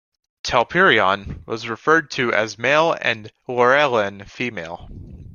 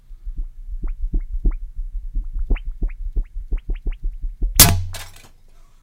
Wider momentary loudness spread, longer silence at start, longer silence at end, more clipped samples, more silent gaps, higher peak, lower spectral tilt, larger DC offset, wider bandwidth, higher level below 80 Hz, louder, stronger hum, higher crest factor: second, 15 LU vs 24 LU; first, 0.45 s vs 0.1 s; second, 0.05 s vs 0.55 s; neither; neither; about the same, -2 dBFS vs 0 dBFS; first, -4 dB/octave vs -2.5 dB/octave; neither; second, 7.2 kHz vs 16 kHz; second, -48 dBFS vs -24 dBFS; about the same, -19 LUFS vs -21 LUFS; neither; about the same, 18 dB vs 22 dB